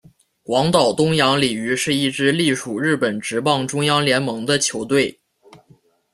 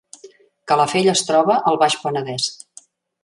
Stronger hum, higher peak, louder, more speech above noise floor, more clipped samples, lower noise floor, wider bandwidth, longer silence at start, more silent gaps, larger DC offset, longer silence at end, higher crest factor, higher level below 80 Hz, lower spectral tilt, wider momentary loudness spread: neither; about the same, 0 dBFS vs -2 dBFS; about the same, -18 LUFS vs -18 LUFS; first, 36 dB vs 31 dB; neither; first, -55 dBFS vs -48 dBFS; first, 14.5 kHz vs 11.5 kHz; first, 0.5 s vs 0.25 s; neither; neither; first, 1 s vs 0.7 s; about the same, 18 dB vs 18 dB; first, -56 dBFS vs -68 dBFS; about the same, -4 dB/octave vs -3.5 dB/octave; second, 5 LU vs 8 LU